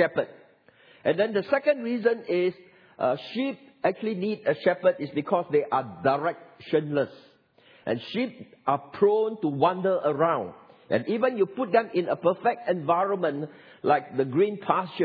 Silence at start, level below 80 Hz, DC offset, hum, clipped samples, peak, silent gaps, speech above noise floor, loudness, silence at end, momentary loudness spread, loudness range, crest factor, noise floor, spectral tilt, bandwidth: 0 s; -76 dBFS; under 0.1%; none; under 0.1%; -6 dBFS; none; 32 dB; -26 LUFS; 0 s; 8 LU; 3 LU; 20 dB; -58 dBFS; -9 dB/octave; 5.2 kHz